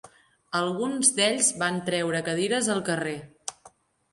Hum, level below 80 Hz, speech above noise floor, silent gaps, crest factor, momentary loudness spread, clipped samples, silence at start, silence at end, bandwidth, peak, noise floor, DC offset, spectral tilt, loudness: none; -70 dBFS; 31 dB; none; 22 dB; 14 LU; under 0.1%; 0.05 s; 0.45 s; 11.5 kHz; -6 dBFS; -57 dBFS; under 0.1%; -2.5 dB/octave; -25 LUFS